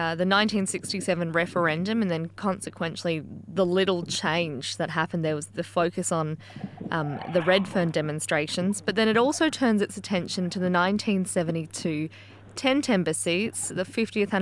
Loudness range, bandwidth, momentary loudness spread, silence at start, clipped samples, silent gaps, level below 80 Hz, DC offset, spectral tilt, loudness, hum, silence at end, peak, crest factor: 3 LU; 12 kHz; 8 LU; 0 s; under 0.1%; none; -68 dBFS; under 0.1%; -4.5 dB/octave; -26 LUFS; none; 0 s; -8 dBFS; 18 dB